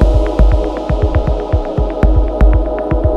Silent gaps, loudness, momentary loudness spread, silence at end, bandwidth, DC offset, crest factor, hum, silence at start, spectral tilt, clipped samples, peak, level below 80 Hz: none; -15 LUFS; 4 LU; 0 s; 5.6 kHz; under 0.1%; 12 dB; none; 0 s; -9 dB/octave; under 0.1%; 0 dBFS; -12 dBFS